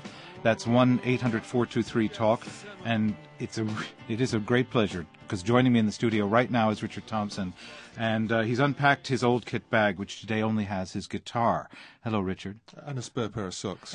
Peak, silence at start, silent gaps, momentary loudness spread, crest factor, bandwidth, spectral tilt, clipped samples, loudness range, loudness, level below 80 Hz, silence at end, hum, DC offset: -8 dBFS; 0 s; none; 13 LU; 20 dB; 10.5 kHz; -6 dB/octave; under 0.1%; 4 LU; -28 LUFS; -56 dBFS; 0 s; none; under 0.1%